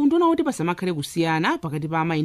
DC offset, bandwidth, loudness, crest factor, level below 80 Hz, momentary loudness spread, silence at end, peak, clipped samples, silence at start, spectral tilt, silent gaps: under 0.1%; 14.5 kHz; -23 LUFS; 14 dB; -58 dBFS; 7 LU; 0 s; -8 dBFS; under 0.1%; 0 s; -6 dB/octave; none